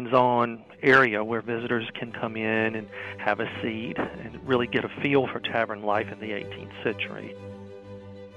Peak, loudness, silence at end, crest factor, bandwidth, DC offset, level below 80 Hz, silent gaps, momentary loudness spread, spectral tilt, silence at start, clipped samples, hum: -6 dBFS; -26 LUFS; 0 s; 20 dB; 8.8 kHz; under 0.1%; -62 dBFS; none; 18 LU; -7 dB/octave; 0 s; under 0.1%; none